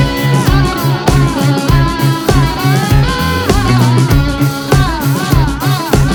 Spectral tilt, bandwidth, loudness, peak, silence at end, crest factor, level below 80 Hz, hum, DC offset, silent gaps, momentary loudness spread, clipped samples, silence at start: -6 dB/octave; over 20 kHz; -12 LUFS; 0 dBFS; 0 s; 10 dB; -20 dBFS; none; under 0.1%; none; 3 LU; under 0.1%; 0 s